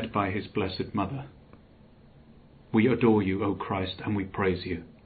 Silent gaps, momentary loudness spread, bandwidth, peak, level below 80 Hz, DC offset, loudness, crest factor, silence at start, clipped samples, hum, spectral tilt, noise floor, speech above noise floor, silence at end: none; 11 LU; 4.8 kHz; -10 dBFS; -58 dBFS; under 0.1%; -28 LUFS; 18 dB; 0 s; under 0.1%; none; -5.5 dB/octave; -54 dBFS; 27 dB; 0.15 s